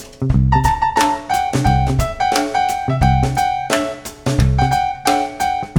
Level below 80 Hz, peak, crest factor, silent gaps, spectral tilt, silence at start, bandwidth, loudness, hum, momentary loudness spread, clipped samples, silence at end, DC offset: -24 dBFS; 0 dBFS; 16 dB; none; -5.5 dB/octave; 0 s; 19.5 kHz; -17 LUFS; none; 4 LU; under 0.1%; 0 s; under 0.1%